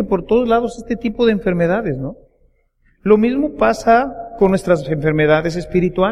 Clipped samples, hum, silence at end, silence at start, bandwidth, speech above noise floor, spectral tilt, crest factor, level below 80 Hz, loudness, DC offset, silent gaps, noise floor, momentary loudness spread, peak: under 0.1%; none; 0 s; 0 s; 12 kHz; 42 dB; -7 dB/octave; 16 dB; -38 dBFS; -16 LUFS; under 0.1%; none; -58 dBFS; 9 LU; 0 dBFS